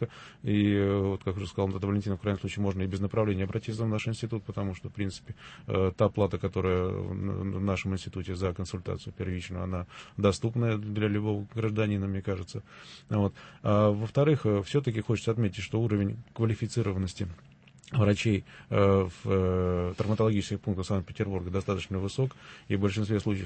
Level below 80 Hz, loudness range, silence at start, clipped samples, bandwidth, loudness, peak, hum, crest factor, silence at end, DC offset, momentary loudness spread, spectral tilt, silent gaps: -54 dBFS; 4 LU; 0 s; under 0.1%; 8.8 kHz; -30 LUFS; -10 dBFS; none; 18 dB; 0 s; under 0.1%; 10 LU; -7.5 dB/octave; none